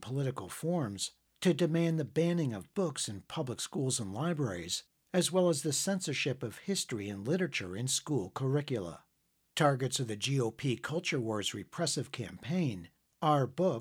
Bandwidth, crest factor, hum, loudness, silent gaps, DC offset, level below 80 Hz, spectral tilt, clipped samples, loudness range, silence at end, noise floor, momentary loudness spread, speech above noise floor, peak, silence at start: 17.5 kHz; 20 dB; none; -33 LUFS; none; under 0.1%; -72 dBFS; -4.5 dB/octave; under 0.1%; 2 LU; 0 s; -76 dBFS; 8 LU; 43 dB; -14 dBFS; 0 s